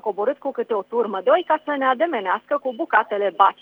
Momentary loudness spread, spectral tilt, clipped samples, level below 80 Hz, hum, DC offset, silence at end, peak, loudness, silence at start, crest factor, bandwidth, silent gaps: 6 LU; -6.5 dB/octave; under 0.1%; -78 dBFS; 50 Hz at -70 dBFS; under 0.1%; 0.1 s; 0 dBFS; -21 LUFS; 0.05 s; 20 dB; over 20 kHz; none